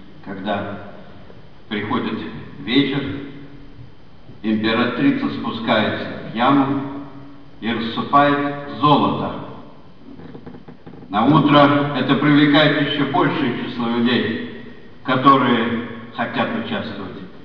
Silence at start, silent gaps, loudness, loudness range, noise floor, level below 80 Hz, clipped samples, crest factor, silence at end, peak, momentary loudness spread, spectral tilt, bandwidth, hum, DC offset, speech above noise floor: 0 s; none; -18 LUFS; 8 LU; -44 dBFS; -52 dBFS; under 0.1%; 18 dB; 0.05 s; 0 dBFS; 20 LU; -8 dB/octave; 5.4 kHz; none; 1%; 26 dB